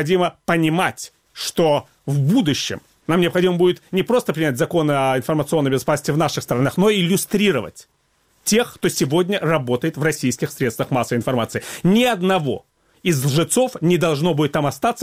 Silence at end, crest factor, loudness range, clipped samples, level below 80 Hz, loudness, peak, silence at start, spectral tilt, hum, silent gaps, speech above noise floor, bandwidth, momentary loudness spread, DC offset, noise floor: 0 s; 16 dB; 2 LU; under 0.1%; -54 dBFS; -19 LUFS; -2 dBFS; 0 s; -5 dB/octave; none; none; 44 dB; 16.5 kHz; 6 LU; 0.1%; -62 dBFS